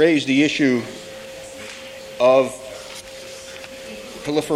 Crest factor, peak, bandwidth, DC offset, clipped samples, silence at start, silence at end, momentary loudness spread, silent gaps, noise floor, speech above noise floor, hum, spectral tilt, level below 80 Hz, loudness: 18 dB; -4 dBFS; 15.5 kHz; under 0.1%; under 0.1%; 0 s; 0 s; 19 LU; none; -37 dBFS; 20 dB; none; -4.5 dB/octave; -56 dBFS; -18 LUFS